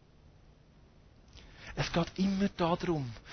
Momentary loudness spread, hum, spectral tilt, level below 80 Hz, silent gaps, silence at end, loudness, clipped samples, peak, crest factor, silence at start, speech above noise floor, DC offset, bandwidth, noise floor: 15 LU; none; -6.5 dB/octave; -54 dBFS; none; 0 s; -33 LUFS; under 0.1%; -16 dBFS; 18 dB; 1.35 s; 28 dB; under 0.1%; 6.6 kHz; -60 dBFS